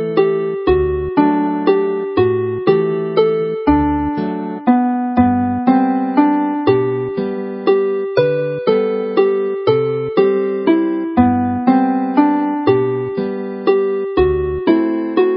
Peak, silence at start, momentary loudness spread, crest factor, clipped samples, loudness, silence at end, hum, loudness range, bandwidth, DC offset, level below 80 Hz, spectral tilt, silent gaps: 0 dBFS; 0 s; 5 LU; 14 dB; under 0.1%; -16 LUFS; 0 s; none; 1 LU; 5.6 kHz; under 0.1%; -36 dBFS; -12.5 dB/octave; none